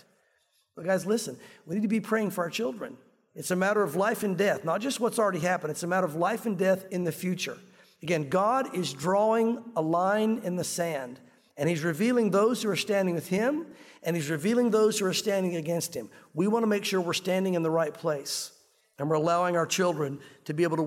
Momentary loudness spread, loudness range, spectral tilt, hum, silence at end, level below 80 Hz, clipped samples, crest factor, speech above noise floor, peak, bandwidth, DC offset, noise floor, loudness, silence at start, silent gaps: 10 LU; 2 LU; -5 dB/octave; none; 0 s; -76 dBFS; under 0.1%; 14 dB; 43 dB; -14 dBFS; 16.5 kHz; under 0.1%; -70 dBFS; -28 LUFS; 0.75 s; none